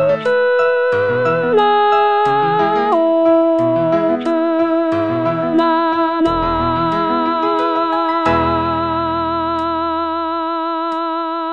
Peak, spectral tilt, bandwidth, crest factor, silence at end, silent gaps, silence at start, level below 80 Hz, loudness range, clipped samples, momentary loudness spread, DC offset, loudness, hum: -2 dBFS; -7.5 dB/octave; 7.2 kHz; 12 dB; 0 s; none; 0 s; -42 dBFS; 3 LU; under 0.1%; 6 LU; 0.3%; -15 LUFS; none